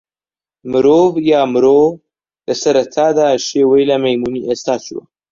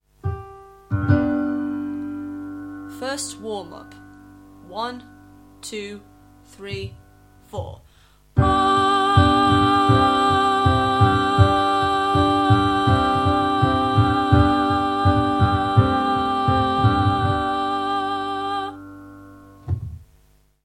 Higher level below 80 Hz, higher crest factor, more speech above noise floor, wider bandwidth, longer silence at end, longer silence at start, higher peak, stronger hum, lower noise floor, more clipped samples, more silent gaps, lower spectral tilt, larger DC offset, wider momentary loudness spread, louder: second, -54 dBFS vs -38 dBFS; second, 12 dB vs 18 dB; first, over 77 dB vs 26 dB; second, 7.6 kHz vs 12 kHz; second, 0.3 s vs 0.6 s; first, 0.65 s vs 0.25 s; about the same, -2 dBFS vs -2 dBFS; second, none vs 50 Hz at -45 dBFS; first, under -90 dBFS vs -57 dBFS; neither; neither; second, -5 dB/octave vs -6.5 dB/octave; neither; second, 11 LU vs 17 LU; first, -13 LUFS vs -19 LUFS